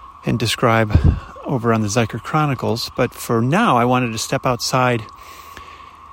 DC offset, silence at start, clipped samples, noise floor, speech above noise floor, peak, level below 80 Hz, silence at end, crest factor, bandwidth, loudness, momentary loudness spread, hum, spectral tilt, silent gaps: under 0.1%; 0 s; under 0.1%; -39 dBFS; 22 dB; -2 dBFS; -32 dBFS; 0 s; 18 dB; 16.5 kHz; -18 LUFS; 21 LU; none; -5.5 dB/octave; none